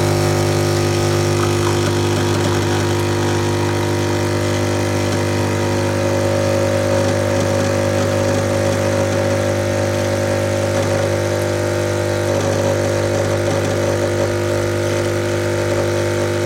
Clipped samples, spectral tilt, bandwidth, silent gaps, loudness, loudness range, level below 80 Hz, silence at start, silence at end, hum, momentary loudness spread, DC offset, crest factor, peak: under 0.1%; -5.5 dB/octave; 16.5 kHz; none; -17 LUFS; 1 LU; -44 dBFS; 0 s; 0 s; 50 Hz at -20 dBFS; 2 LU; under 0.1%; 14 dB; -4 dBFS